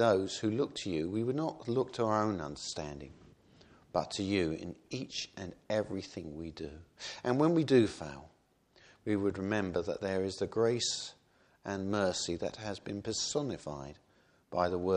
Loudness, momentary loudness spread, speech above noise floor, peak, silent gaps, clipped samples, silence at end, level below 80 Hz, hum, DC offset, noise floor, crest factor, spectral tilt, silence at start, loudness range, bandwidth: -34 LUFS; 15 LU; 33 dB; -14 dBFS; none; under 0.1%; 0 s; -62 dBFS; none; under 0.1%; -67 dBFS; 22 dB; -5 dB/octave; 0 s; 5 LU; 10.5 kHz